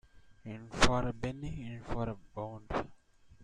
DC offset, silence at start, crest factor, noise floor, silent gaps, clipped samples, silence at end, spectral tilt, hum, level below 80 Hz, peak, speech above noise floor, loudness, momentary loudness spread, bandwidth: under 0.1%; 0.15 s; 26 dB; -60 dBFS; none; under 0.1%; 0 s; -4.5 dB/octave; none; -44 dBFS; -10 dBFS; 26 dB; -36 LUFS; 18 LU; 11.5 kHz